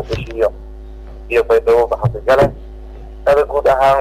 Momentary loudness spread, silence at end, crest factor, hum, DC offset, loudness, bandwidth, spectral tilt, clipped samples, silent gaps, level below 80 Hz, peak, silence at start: 23 LU; 0 s; 10 dB; none; under 0.1%; -15 LUFS; 15.5 kHz; -6.5 dB/octave; under 0.1%; none; -32 dBFS; -4 dBFS; 0 s